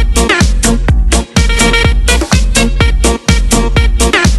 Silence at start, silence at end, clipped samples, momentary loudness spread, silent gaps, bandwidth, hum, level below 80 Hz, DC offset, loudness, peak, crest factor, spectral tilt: 0 s; 0 s; 0.2%; 3 LU; none; 12.5 kHz; none; -12 dBFS; under 0.1%; -10 LUFS; 0 dBFS; 8 dB; -4 dB/octave